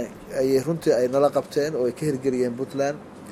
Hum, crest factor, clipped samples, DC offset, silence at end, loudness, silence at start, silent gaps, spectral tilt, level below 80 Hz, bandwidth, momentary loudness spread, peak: none; 18 dB; under 0.1%; under 0.1%; 0 s; -24 LUFS; 0 s; none; -6 dB/octave; -58 dBFS; 15.5 kHz; 6 LU; -6 dBFS